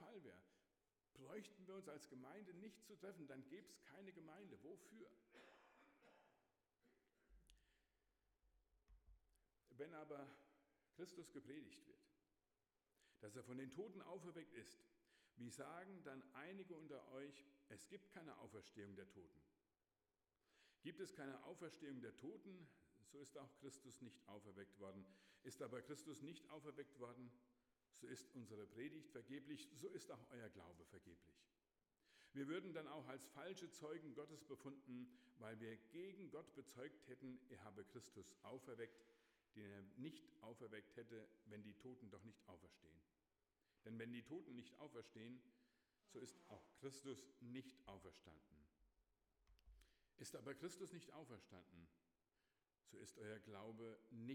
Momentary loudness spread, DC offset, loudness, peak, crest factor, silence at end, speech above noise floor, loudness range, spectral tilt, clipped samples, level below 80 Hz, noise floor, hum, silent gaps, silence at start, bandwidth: 10 LU; under 0.1%; -59 LUFS; -40 dBFS; 22 dB; 0 s; over 31 dB; 6 LU; -5 dB/octave; under 0.1%; -88 dBFS; under -90 dBFS; none; none; 0 s; 16.5 kHz